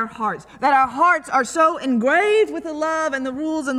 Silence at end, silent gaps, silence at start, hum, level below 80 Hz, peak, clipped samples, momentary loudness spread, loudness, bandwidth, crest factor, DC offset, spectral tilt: 0 s; none; 0 s; none; -58 dBFS; -4 dBFS; under 0.1%; 8 LU; -19 LUFS; 13 kHz; 14 dB; under 0.1%; -4 dB/octave